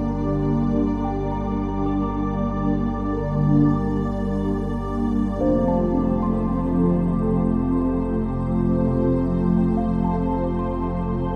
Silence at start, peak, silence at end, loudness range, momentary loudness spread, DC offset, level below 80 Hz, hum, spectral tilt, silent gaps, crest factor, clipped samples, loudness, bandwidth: 0 s; -6 dBFS; 0 s; 1 LU; 5 LU; under 0.1%; -30 dBFS; none; -10.5 dB/octave; none; 14 dB; under 0.1%; -22 LUFS; 8 kHz